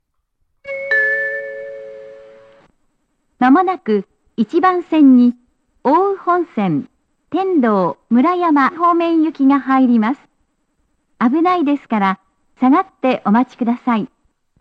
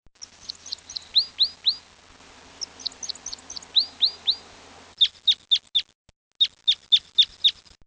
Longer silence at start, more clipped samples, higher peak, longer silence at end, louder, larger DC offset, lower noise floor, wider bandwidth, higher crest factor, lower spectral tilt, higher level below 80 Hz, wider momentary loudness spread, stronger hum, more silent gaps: first, 0.65 s vs 0.5 s; neither; first, -2 dBFS vs -8 dBFS; first, 0.55 s vs 0.35 s; first, -15 LUFS vs -21 LUFS; neither; first, -67 dBFS vs -51 dBFS; second, 5.4 kHz vs 8 kHz; second, 14 dB vs 20 dB; first, -8 dB/octave vs 1.5 dB/octave; about the same, -64 dBFS vs -62 dBFS; about the same, 14 LU vs 16 LU; neither; second, none vs 5.95-6.05 s, 6.16-6.31 s